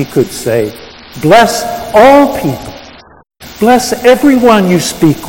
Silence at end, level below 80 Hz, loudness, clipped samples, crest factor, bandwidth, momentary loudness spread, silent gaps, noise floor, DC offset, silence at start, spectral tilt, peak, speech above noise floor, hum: 0 s; -38 dBFS; -8 LUFS; 3%; 10 dB; 18 kHz; 12 LU; none; -34 dBFS; under 0.1%; 0 s; -5 dB/octave; 0 dBFS; 26 dB; none